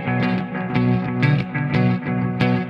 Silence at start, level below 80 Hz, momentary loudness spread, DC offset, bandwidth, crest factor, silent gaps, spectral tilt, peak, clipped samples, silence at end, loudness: 0 s; -50 dBFS; 4 LU; under 0.1%; 6 kHz; 16 dB; none; -9 dB/octave; -4 dBFS; under 0.1%; 0 s; -20 LUFS